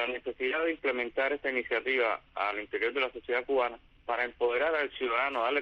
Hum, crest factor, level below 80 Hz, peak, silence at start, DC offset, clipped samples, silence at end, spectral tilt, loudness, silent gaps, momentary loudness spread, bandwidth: none; 14 dB; -64 dBFS; -16 dBFS; 0 s; under 0.1%; under 0.1%; 0 s; -5 dB/octave; -30 LUFS; none; 5 LU; 6 kHz